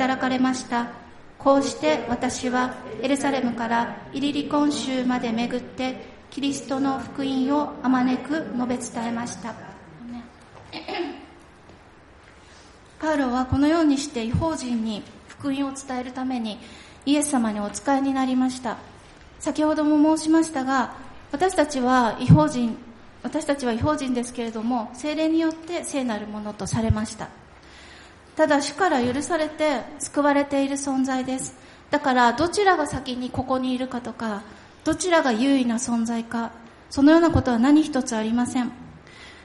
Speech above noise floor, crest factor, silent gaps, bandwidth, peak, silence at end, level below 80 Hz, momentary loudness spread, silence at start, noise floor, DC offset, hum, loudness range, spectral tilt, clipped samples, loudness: 27 dB; 22 dB; none; 11.5 kHz; -2 dBFS; 0 s; -50 dBFS; 14 LU; 0 s; -49 dBFS; under 0.1%; none; 6 LU; -5 dB/octave; under 0.1%; -23 LUFS